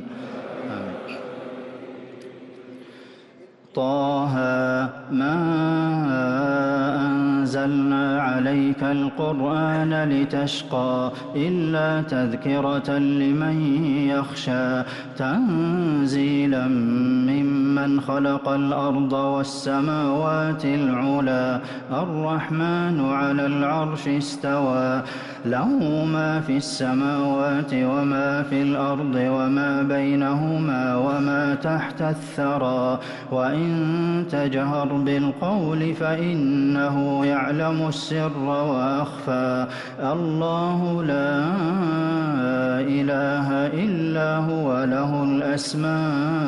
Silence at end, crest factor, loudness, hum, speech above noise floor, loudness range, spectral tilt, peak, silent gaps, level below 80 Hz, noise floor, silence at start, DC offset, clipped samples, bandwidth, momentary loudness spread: 0 s; 10 dB; -23 LUFS; none; 27 dB; 2 LU; -7 dB/octave; -12 dBFS; none; -62 dBFS; -48 dBFS; 0 s; under 0.1%; under 0.1%; 11 kHz; 5 LU